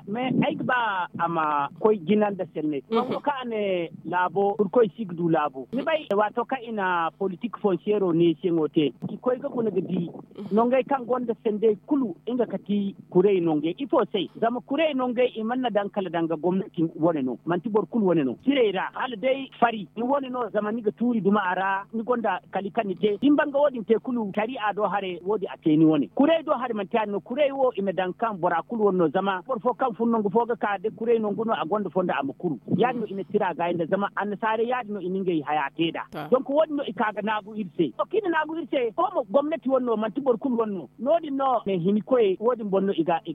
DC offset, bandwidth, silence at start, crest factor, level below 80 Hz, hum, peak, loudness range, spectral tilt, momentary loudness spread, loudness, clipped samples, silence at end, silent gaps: under 0.1%; 4.8 kHz; 0 s; 18 dB; -70 dBFS; none; -6 dBFS; 2 LU; -9 dB/octave; 6 LU; -25 LUFS; under 0.1%; 0 s; none